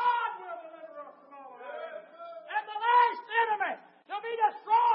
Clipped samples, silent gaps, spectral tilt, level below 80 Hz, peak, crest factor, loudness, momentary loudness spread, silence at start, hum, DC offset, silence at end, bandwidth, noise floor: under 0.1%; none; 3 dB/octave; under -90 dBFS; -14 dBFS; 16 dB; -29 LUFS; 21 LU; 0 s; none; under 0.1%; 0 s; 5.6 kHz; -50 dBFS